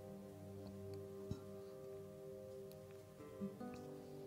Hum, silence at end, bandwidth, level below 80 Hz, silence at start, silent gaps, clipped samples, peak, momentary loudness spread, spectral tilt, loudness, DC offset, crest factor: none; 0 s; 16 kHz; -74 dBFS; 0 s; none; under 0.1%; -32 dBFS; 5 LU; -7 dB/octave; -53 LUFS; under 0.1%; 20 dB